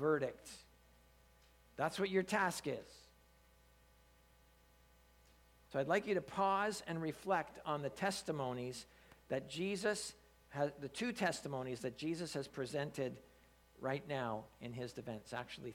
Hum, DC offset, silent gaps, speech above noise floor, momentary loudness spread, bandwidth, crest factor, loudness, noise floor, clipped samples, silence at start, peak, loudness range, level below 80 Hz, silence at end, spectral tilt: none; under 0.1%; none; 28 dB; 12 LU; 18.5 kHz; 20 dB; -41 LUFS; -68 dBFS; under 0.1%; 0 s; -22 dBFS; 5 LU; -70 dBFS; 0 s; -4.5 dB/octave